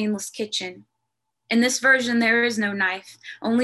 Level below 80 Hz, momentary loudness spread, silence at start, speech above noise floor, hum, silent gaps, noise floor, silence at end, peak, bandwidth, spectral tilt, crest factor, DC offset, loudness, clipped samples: -70 dBFS; 14 LU; 0 s; 58 dB; none; none; -80 dBFS; 0 s; -6 dBFS; 12.5 kHz; -3 dB/octave; 18 dB; under 0.1%; -21 LUFS; under 0.1%